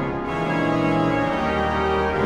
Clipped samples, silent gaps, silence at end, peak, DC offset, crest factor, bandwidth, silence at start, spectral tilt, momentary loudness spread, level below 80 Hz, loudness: under 0.1%; none; 0 s; -8 dBFS; under 0.1%; 14 dB; 11 kHz; 0 s; -7 dB/octave; 4 LU; -38 dBFS; -22 LUFS